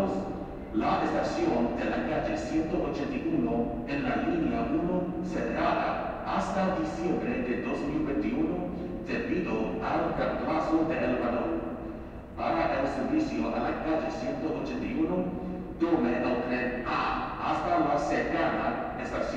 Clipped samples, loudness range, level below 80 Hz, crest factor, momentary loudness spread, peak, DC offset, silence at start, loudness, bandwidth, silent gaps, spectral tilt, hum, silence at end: under 0.1%; 2 LU; -46 dBFS; 16 dB; 6 LU; -12 dBFS; under 0.1%; 0 s; -30 LUFS; 8.8 kHz; none; -7 dB/octave; none; 0 s